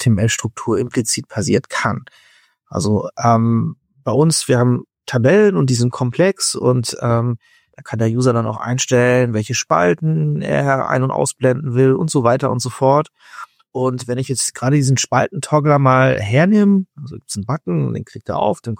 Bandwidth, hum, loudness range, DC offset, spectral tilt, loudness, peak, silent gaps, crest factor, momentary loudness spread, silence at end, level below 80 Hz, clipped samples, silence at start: 16.5 kHz; none; 3 LU; under 0.1%; -5.5 dB/octave; -16 LUFS; -2 dBFS; none; 16 dB; 10 LU; 0.05 s; -52 dBFS; under 0.1%; 0 s